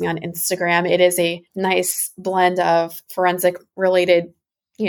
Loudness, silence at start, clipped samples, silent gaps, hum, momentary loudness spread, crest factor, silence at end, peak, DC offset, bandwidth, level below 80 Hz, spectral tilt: -19 LUFS; 0 s; under 0.1%; none; none; 7 LU; 16 dB; 0 s; -4 dBFS; under 0.1%; 18.5 kHz; -64 dBFS; -3.5 dB/octave